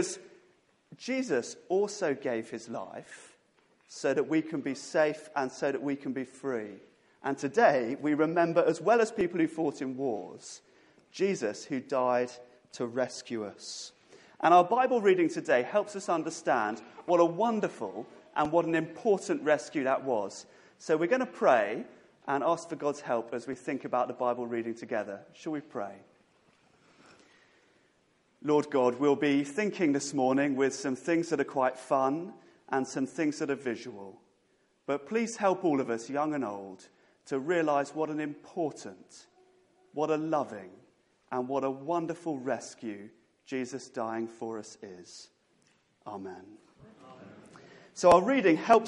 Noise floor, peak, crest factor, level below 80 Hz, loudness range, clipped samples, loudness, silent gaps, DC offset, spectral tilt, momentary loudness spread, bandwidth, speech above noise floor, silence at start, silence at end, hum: -70 dBFS; -8 dBFS; 24 dB; -72 dBFS; 9 LU; under 0.1%; -30 LUFS; none; under 0.1%; -5 dB/octave; 18 LU; 11.5 kHz; 41 dB; 0 s; 0 s; none